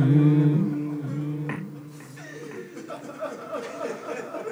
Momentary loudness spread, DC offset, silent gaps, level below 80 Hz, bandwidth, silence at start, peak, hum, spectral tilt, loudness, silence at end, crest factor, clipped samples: 20 LU; under 0.1%; none; -76 dBFS; over 20 kHz; 0 s; -8 dBFS; none; -8.5 dB/octave; -26 LUFS; 0 s; 16 dB; under 0.1%